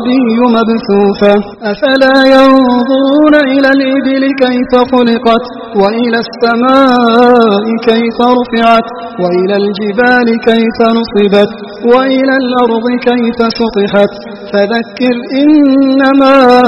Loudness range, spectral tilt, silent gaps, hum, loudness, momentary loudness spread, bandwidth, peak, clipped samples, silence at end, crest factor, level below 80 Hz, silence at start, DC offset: 3 LU; -6.5 dB/octave; none; none; -8 LUFS; 7 LU; 7.8 kHz; 0 dBFS; 1%; 0 s; 8 dB; -44 dBFS; 0 s; under 0.1%